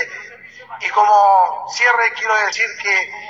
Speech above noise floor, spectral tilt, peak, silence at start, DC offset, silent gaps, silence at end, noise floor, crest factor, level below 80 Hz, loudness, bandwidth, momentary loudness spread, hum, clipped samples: 23 dB; 0.5 dB/octave; -2 dBFS; 0 s; under 0.1%; none; 0 s; -38 dBFS; 16 dB; -68 dBFS; -15 LUFS; 7.8 kHz; 13 LU; none; under 0.1%